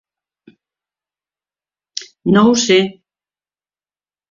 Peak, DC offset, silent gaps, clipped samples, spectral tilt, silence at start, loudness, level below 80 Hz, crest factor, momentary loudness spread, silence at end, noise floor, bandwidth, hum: 0 dBFS; under 0.1%; none; under 0.1%; -4.5 dB/octave; 1.95 s; -13 LUFS; -58 dBFS; 18 dB; 18 LU; 1.4 s; under -90 dBFS; 7.6 kHz; 50 Hz at -40 dBFS